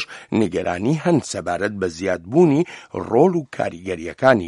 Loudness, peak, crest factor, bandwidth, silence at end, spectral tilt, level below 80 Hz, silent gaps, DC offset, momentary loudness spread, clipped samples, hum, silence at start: -20 LUFS; 0 dBFS; 20 dB; 11.5 kHz; 0 s; -6.5 dB/octave; -54 dBFS; none; under 0.1%; 10 LU; under 0.1%; none; 0 s